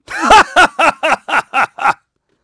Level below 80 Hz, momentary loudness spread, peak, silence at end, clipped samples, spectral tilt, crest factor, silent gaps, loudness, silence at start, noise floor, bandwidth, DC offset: -38 dBFS; 9 LU; 0 dBFS; 0.5 s; 0.1%; -2 dB/octave; 12 dB; none; -11 LUFS; 0.1 s; -48 dBFS; 11 kHz; under 0.1%